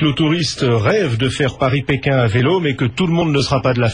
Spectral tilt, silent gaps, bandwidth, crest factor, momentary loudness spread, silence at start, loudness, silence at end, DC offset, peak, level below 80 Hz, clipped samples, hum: -6 dB/octave; none; 10.5 kHz; 12 dB; 3 LU; 0 s; -16 LUFS; 0 s; 0.2%; -4 dBFS; -42 dBFS; under 0.1%; none